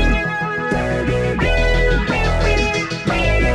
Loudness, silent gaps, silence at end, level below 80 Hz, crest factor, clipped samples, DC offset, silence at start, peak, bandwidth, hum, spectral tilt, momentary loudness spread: -18 LUFS; none; 0 s; -20 dBFS; 12 dB; under 0.1%; under 0.1%; 0 s; -4 dBFS; 10.5 kHz; none; -5.5 dB/octave; 4 LU